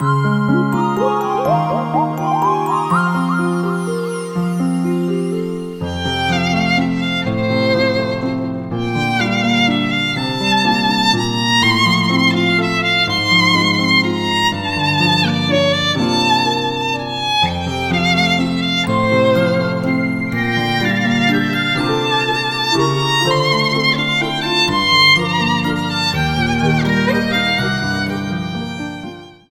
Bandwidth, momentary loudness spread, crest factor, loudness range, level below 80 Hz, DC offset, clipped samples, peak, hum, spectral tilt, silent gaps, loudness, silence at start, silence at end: 16 kHz; 7 LU; 14 dB; 4 LU; -42 dBFS; under 0.1%; under 0.1%; -2 dBFS; none; -5 dB/octave; none; -15 LUFS; 0 s; 0.15 s